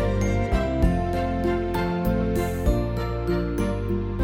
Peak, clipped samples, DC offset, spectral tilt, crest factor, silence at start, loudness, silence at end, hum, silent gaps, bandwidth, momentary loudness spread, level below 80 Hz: -8 dBFS; under 0.1%; under 0.1%; -7.5 dB/octave; 14 dB; 0 s; -25 LUFS; 0 s; none; none; 17 kHz; 3 LU; -28 dBFS